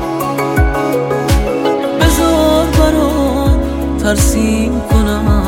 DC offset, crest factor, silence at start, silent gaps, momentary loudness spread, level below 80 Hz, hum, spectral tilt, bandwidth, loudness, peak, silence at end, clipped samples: under 0.1%; 12 dB; 0 s; none; 4 LU; -18 dBFS; none; -5.5 dB/octave; 16.5 kHz; -13 LUFS; 0 dBFS; 0 s; under 0.1%